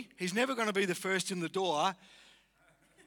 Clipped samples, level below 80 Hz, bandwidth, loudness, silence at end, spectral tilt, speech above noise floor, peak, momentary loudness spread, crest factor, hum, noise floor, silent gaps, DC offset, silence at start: under 0.1%; -80 dBFS; 20 kHz; -33 LUFS; 1.1 s; -3.5 dB/octave; 35 dB; -16 dBFS; 4 LU; 20 dB; none; -68 dBFS; none; under 0.1%; 0 s